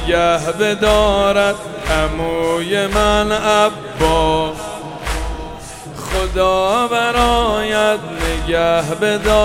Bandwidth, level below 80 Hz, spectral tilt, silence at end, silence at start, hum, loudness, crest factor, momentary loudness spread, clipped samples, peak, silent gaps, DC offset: 16.5 kHz; -28 dBFS; -4 dB/octave; 0 s; 0 s; none; -16 LUFS; 16 dB; 10 LU; under 0.1%; 0 dBFS; none; 0.1%